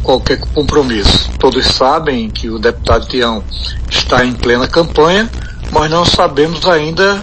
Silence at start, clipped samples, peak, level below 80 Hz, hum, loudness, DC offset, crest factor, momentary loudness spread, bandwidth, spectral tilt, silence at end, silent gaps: 0 s; 0.2%; 0 dBFS; -22 dBFS; none; -12 LUFS; under 0.1%; 12 dB; 7 LU; 9.4 kHz; -4.5 dB/octave; 0 s; none